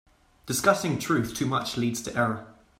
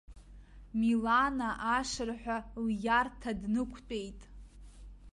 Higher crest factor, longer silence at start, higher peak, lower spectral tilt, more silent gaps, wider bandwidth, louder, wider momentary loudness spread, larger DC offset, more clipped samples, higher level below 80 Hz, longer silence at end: about the same, 22 dB vs 18 dB; first, 0.45 s vs 0.1 s; first, -6 dBFS vs -16 dBFS; about the same, -4.5 dB/octave vs -4.5 dB/octave; neither; first, 16 kHz vs 11.5 kHz; first, -26 LUFS vs -33 LUFS; second, 6 LU vs 12 LU; neither; neither; second, -58 dBFS vs -52 dBFS; first, 0.25 s vs 0.05 s